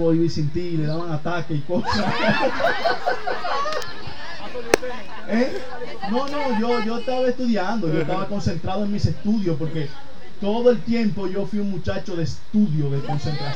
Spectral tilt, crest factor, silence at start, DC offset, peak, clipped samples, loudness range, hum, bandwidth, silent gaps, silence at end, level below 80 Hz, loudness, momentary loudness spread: -6.5 dB/octave; 24 dB; 0 s; 7%; 0 dBFS; under 0.1%; 2 LU; none; 16 kHz; none; 0 s; -46 dBFS; -23 LUFS; 10 LU